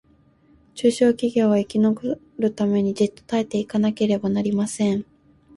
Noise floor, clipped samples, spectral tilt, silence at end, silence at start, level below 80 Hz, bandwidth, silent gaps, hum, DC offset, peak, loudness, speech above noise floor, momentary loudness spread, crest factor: -57 dBFS; under 0.1%; -6.5 dB/octave; 0.55 s; 0.75 s; -60 dBFS; 11.5 kHz; none; none; under 0.1%; -6 dBFS; -22 LUFS; 36 dB; 7 LU; 16 dB